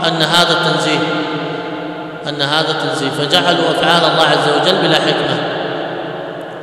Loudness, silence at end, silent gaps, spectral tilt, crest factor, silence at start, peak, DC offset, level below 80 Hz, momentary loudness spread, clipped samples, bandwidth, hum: -14 LUFS; 0 s; none; -4 dB/octave; 14 dB; 0 s; 0 dBFS; under 0.1%; -56 dBFS; 13 LU; 0.2%; 16 kHz; none